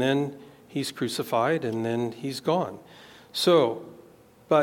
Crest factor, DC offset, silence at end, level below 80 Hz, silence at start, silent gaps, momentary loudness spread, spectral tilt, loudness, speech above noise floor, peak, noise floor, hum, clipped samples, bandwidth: 18 dB; under 0.1%; 0 s; -72 dBFS; 0 s; none; 15 LU; -5 dB/octave; -26 LUFS; 28 dB; -8 dBFS; -54 dBFS; none; under 0.1%; 17.5 kHz